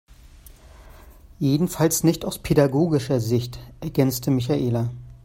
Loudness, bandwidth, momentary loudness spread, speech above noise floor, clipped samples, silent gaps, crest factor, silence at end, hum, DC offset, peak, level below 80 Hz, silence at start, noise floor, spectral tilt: -22 LUFS; 16.5 kHz; 9 LU; 25 dB; under 0.1%; none; 20 dB; 0.1 s; none; under 0.1%; -4 dBFS; -46 dBFS; 0.45 s; -47 dBFS; -6 dB/octave